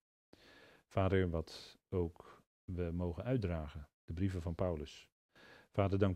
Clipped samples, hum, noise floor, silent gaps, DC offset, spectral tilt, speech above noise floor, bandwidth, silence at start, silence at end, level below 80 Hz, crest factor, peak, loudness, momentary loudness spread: under 0.1%; none; -63 dBFS; 2.47-2.68 s, 3.94-4.08 s, 5.12-5.29 s; under 0.1%; -8 dB/octave; 26 dB; 9.4 kHz; 0.9 s; 0 s; -58 dBFS; 22 dB; -16 dBFS; -39 LUFS; 17 LU